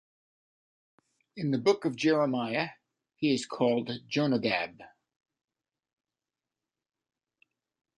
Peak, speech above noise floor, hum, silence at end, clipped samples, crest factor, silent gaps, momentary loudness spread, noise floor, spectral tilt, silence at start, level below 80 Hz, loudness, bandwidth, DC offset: -12 dBFS; over 61 dB; none; 3.1 s; under 0.1%; 20 dB; none; 8 LU; under -90 dBFS; -5.5 dB/octave; 1.35 s; -74 dBFS; -29 LUFS; 11 kHz; under 0.1%